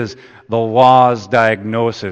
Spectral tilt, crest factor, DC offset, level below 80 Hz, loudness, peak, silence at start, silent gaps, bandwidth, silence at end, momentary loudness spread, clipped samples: -6.5 dB/octave; 14 dB; under 0.1%; -56 dBFS; -13 LUFS; 0 dBFS; 0 s; none; 8.6 kHz; 0 s; 11 LU; 0.1%